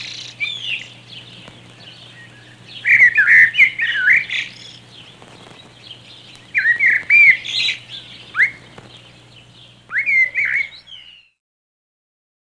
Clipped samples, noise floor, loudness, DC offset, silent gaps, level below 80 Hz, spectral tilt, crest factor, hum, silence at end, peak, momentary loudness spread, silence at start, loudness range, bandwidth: under 0.1%; -45 dBFS; -13 LUFS; under 0.1%; none; -62 dBFS; -1 dB/octave; 18 dB; 60 Hz at -50 dBFS; 1.55 s; 0 dBFS; 23 LU; 0 s; 8 LU; 10.5 kHz